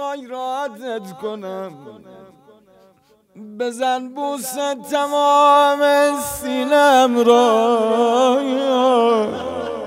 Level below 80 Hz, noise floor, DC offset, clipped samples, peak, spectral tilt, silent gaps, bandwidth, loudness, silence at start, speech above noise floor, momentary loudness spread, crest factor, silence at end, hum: -58 dBFS; -55 dBFS; under 0.1%; under 0.1%; -2 dBFS; -3 dB/octave; none; 16 kHz; -17 LUFS; 0 s; 38 dB; 15 LU; 16 dB; 0 s; none